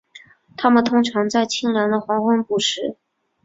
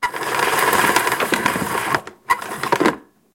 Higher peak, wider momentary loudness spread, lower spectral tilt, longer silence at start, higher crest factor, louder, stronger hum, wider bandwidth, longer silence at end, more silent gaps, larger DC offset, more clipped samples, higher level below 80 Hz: about the same, -2 dBFS vs 0 dBFS; about the same, 8 LU vs 7 LU; first, -4 dB/octave vs -2.5 dB/octave; first, 0.15 s vs 0 s; about the same, 18 dB vs 18 dB; about the same, -19 LUFS vs -19 LUFS; neither; second, 7.8 kHz vs 17 kHz; first, 0.5 s vs 0.35 s; neither; neither; neither; second, -62 dBFS vs -56 dBFS